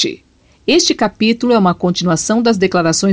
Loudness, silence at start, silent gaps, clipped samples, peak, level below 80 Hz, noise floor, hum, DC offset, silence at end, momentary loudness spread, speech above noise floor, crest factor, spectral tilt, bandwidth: -14 LUFS; 0 s; none; under 0.1%; -2 dBFS; -46 dBFS; -50 dBFS; none; under 0.1%; 0 s; 4 LU; 37 dB; 12 dB; -4 dB/octave; 10 kHz